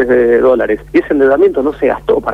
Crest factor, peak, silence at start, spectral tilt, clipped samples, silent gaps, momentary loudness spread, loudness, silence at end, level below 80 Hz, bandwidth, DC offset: 10 dB; -2 dBFS; 0 s; -7.5 dB/octave; under 0.1%; none; 5 LU; -11 LUFS; 0 s; -38 dBFS; 5.2 kHz; under 0.1%